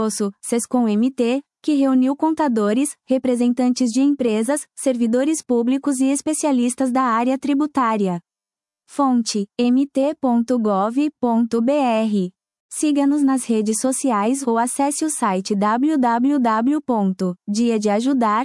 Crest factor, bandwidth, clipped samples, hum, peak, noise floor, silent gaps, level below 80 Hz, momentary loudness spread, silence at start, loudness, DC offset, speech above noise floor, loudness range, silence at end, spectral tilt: 12 dB; 12 kHz; under 0.1%; none; -6 dBFS; under -90 dBFS; 12.60-12.69 s; -70 dBFS; 4 LU; 0 s; -19 LUFS; under 0.1%; over 72 dB; 1 LU; 0 s; -5 dB/octave